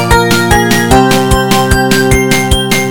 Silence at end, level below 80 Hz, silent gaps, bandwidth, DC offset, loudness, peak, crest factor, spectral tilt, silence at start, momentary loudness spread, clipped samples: 0 s; -18 dBFS; none; 18 kHz; 3%; -8 LUFS; 0 dBFS; 8 dB; -4.5 dB/octave; 0 s; 2 LU; 1%